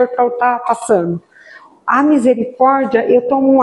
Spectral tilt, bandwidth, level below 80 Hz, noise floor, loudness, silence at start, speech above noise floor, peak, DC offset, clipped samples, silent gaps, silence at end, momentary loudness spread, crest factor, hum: -6.5 dB/octave; 11.5 kHz; -60 dBFS; -41 dBFS; -14 LUFS; 0 s; 28 dB; 0 dBFS; under 0.1%; under 0.1%; none; 0 s; 6 LU; 12 dB; none